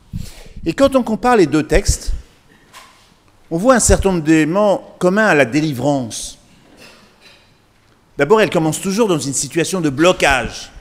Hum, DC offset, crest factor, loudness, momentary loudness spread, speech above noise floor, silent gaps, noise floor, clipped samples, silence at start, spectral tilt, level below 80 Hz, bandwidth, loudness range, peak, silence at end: none; under 0.1%; 16 dB; -15 LUFS; 14 LU; 38 dB; none; -53 dBFS; under 0.1%; 0.15 s; -4.5 dB/octave; -30 dBFS; 16 kHz; 5 LU; 0 dBFS; 0 s